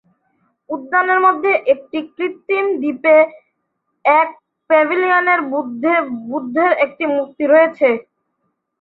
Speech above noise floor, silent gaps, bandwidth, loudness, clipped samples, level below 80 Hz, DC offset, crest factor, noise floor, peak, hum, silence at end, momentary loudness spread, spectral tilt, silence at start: 56 dB; none; 4.6 kHz; -16 LUFS; under 0.1%; -68 dBFS; under 0.1%; 16 dB; -71 dBFS; -2 dBFS; none; 0.8 s; 11 LU; -7.5 dB/octave; 0.7 s